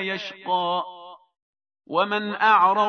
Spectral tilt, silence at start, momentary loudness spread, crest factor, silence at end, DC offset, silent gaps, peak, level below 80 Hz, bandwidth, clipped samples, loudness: -5 dB/octave; 0 s; 14 LU; 18 dB; 0 s; under 0.1%; 1.42-1.53 s; -6 dBFS; -86 dBFS; 6.6 kHz; under 0.1%; -22 LUFS